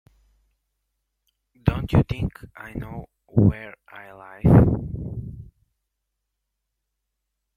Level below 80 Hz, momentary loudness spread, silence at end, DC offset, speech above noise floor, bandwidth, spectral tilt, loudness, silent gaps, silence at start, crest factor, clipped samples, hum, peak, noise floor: -38 dBFS; 25 LU; 2.1 s; under 0.1%; 59 dB; 5.4 kHz; -10 dB/octave; -21 LUFS; none; 1.65 s; 22 dB; under 0.1%; none; -2 dBFS; -80 dBFS